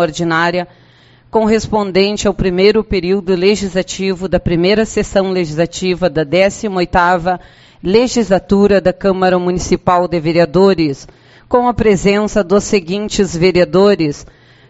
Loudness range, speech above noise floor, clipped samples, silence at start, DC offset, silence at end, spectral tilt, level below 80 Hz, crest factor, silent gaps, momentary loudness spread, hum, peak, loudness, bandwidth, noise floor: 2 LU; 33 dB; under 0.1%; 0 s; under 0.1%; 0.45 s; -5.5 dB/octave; -34 dBFS; 14 dB; none; 7 LU; none; 0 dBFS; -13 LUFS; 8.2 kHz; -46 dBFS